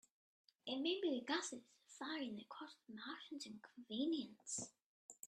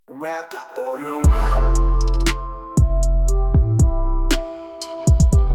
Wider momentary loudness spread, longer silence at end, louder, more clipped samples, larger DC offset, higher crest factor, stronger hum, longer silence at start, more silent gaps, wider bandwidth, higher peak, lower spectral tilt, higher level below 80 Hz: first, 15 LU vs 12 LU; about the same, 0 s vs 0 s; second, -46 LUFS vs -20 LUFS; neither; neither; first, 20 dB vs 12 dB; neither; first, 0.65 s vs 0.1 s; first, 4.84-5.09 s vs none; second, 13 kHz vs 14.5 kHz; second, -28 dBFS vs -4 dBFS; second, -2.5 dB/octave vs -6 dB/octave; second, under -90 dBFS vs -18 dBFS